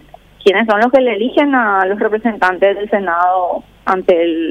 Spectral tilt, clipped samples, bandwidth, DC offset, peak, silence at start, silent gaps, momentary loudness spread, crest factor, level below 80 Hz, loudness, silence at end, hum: -6 dB/octave; under 0.1%; 9.8 kHz; under 0.1%; 0 dBFS; 0.4 s; none; 5 LU; 12 dB; -50 dBFS; -14 LUFS; 0 s; 50 Hz at -50 dBFS